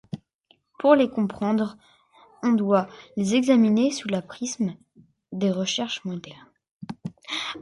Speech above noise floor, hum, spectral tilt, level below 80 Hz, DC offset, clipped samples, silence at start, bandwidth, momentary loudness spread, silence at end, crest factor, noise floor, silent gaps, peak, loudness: 41 dB; none; -5 dB/octave; -66 dBFS; under 0.1%; under 0.1%; 0.15 s; 11.5 kHz; 19 LU; 0 s; 22 dB; -64 dBFS; 0.34-0.39 s; -4 dBFS; -24 LUFS